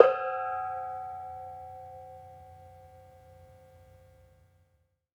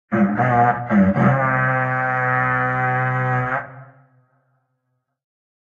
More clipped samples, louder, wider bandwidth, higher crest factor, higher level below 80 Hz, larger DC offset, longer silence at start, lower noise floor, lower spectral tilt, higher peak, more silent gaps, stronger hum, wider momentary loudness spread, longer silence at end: neither; second, -33 LUFS vs -18 LUFS; first, 7.4 kHz vs 6.6 kHz; first, 32 dB vs 16 dB; second, -70 dBFS vs -52 dBFS; neither; about the same, 0 s vs 0.1 s; about the same, -72 dBFS vs -73 dBFS; second, -5.5 dB/octave vs -9.5 dB/octave; about the same, -2 dBFS vs -4 dBFS; neither; neither; first, 23 LU vs 5 LU; first, 2.3 s vs 1.85 s